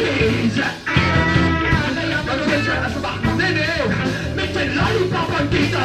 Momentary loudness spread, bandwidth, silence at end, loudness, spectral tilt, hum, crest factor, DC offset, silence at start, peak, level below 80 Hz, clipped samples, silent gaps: 5 LU; 13 kHz; 0 s; -18 LUFS; -5.5 dB/octave; none; 16 dB; under 0.1%; 0 s; -2 dBFS; -32 dBFS; under 0.1%; none